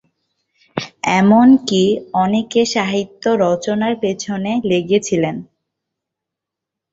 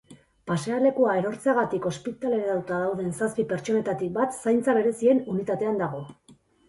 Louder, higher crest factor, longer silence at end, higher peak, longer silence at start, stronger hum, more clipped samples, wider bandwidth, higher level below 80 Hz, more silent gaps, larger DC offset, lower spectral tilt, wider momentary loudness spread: first, -16 LUFS vs -25 LUFS; about the same, 16 dB vs 16 dB; first, 1.5 s vs 0.35 s; first, -2 dBFS vs -10 dBFS; first, 0.75 s vs 0.1 s; neither; neither; second, 8 kHz vs 11.5 kHz; first, -56 dBFS vs -64 dBFS; neither; neither; about the same, -5.5 dB/octave vs -6.5 dB/octave; about the same, 11 LU vs 9 LU